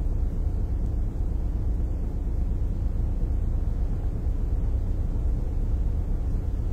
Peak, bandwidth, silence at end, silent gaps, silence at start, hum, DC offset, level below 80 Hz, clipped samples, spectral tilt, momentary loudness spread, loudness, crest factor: -16 dBFS; 2.5 kHz; 0 s; none; 0 s; none; under 0.1%; -26 dBFS; under 0.1%; -9.5 dB/octave; 1 LU; -30 LUFS; 10 dB